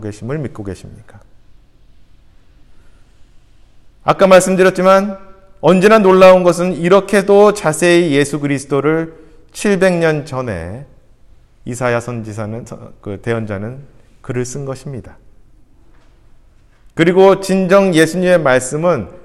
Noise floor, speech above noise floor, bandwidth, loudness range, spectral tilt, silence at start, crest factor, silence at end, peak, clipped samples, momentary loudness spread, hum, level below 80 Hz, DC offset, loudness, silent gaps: -46 dBFS; 33 dB; 14.5 kHz; 15 LU; -5.5 dB/octave; 0 s; 14 dB; 0.1 s; 0 dBFS; 0.1%; 20 LU; none; -46 dBFS; under 0.1%; -12 LUFS; none